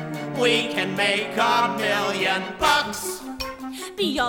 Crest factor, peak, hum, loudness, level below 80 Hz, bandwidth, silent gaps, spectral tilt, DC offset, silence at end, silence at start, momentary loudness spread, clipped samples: 18 dB; -6 dBFS; none; -22 LUFS; -52 dBFS; 18.5 kHz; none; -3 dB/octave; under 0.1%; 0 s; 0 s; 12 LU; under 0.1%